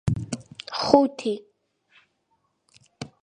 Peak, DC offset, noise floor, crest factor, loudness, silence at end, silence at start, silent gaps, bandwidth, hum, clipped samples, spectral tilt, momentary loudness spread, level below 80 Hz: 0 dBFS; under 0.1%; -72 dBFS; 26 dB; -24 LUFS; 0.15 s; 0.05 s; none; 10.5 kHz; none; under 0.1%; -6 dB/octave; 19 LU; -50 dBFS